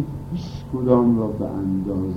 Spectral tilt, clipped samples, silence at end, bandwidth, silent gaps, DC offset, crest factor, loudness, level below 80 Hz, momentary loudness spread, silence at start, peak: -10 dB/octave; under 0.1%; 0 s; 6.8 kHz; none; under 0.1%; 18 dB; -22 LUFS; -42 dBFS; 13 LU; 0 s; -4 dBFS